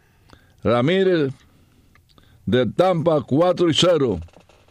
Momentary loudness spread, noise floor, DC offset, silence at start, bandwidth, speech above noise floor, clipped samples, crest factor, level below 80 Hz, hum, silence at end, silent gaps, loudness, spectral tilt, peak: 10 LU; -55 dBFS; under 0.1%; 0.65 s; 10.5 kHz; 37 dB; under 0.1%; 16 dB; -50 dBFS; none; 0.45 s; none; -19 LUFS; -6 dB/octave; -4 dBFS